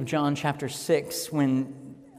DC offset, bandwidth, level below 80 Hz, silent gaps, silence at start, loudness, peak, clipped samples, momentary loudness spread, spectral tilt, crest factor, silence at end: under 0.1%; 16 kHz; -66 dBFS; none; 0 s; -27 LUFS; -12 dBFS; under 0.1%; 8 LU; -5.5 dB/octave; 16 dB; 0 s